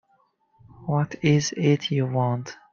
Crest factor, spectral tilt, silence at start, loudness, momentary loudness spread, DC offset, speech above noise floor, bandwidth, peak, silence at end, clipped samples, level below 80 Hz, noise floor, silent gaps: 18 dB; -6 dB/octave; 0.8 s; -24 LUFS; 7 LU; under 0.1%; 43 dB; 7.4 kHz; -8 dBFS; 0.2 s; under 0.1%; -60 dBFS; -66 dBFS; none